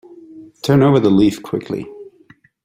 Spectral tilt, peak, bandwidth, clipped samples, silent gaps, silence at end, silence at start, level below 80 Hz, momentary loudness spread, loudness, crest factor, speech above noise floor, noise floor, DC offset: -7.5 dB/octave; -2 dBFS; 16 kHz; under 0.1%; none; 0.55 s; 0.35 s; -52 dBFS; 15 LU; -16 LUFS; 16 dB; 36 dB; -50 dBFS; under 0.1%